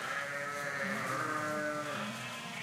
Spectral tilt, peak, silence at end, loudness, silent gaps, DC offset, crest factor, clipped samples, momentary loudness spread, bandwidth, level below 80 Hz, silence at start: -3.5 dB/octave; -22 dBFS; 0 s; -36 LUFS; none; under 0.1%; 14 dB; under 0.1%; 4 LU; 16 kHz; -80 dBFS; 0 s